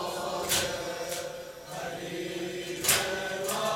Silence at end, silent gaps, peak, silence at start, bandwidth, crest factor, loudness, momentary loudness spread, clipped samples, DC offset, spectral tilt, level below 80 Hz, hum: 0 s; none; -4 dBFS; 0 s; 16.5 kHz; 28 dB; -30 LUFS; 13 LU; under 0.1%; under 0.1%; -2 dB/octave; -60 dBFS; none